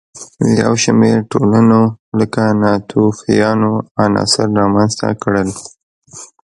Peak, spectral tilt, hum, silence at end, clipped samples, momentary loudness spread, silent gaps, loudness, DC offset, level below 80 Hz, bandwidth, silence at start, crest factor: 0 dBFS; -5.5 dB/octave; none; 0.25 s; under 0.1%; 8 LU; 1.99-2.12 s, 3.91-3.95 s, 5.83-6.02 s; -13 LUFS; under 0.1%; -46 dBFS; 11 kHz; 0.15 s; 14 dB